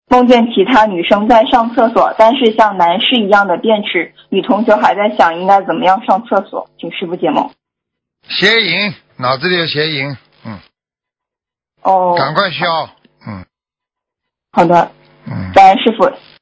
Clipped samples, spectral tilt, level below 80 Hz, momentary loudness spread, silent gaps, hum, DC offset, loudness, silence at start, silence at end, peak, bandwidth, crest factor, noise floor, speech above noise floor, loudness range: 0.9%; -5.5 dB/octave; -48 dBFS; 15 LU; none; none; under 0.1%; -11 LUFS; 0.1 s; 0.25 s; 0 dBFS; 8 kHz; 12 dB; -86 dBFS; 75 dB; 7 LU